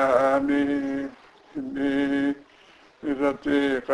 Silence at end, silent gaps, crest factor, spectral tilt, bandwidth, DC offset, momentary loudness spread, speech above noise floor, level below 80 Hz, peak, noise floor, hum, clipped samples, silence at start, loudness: 0 s; none; 18 dB; -6 dB/octave; 11 kHz; under 0.1%; 15 LU; 30 dB; -56 dBFS; -8 dBFS; -54 dBFS; none; under 0.1%; 0 s; -25 LUFS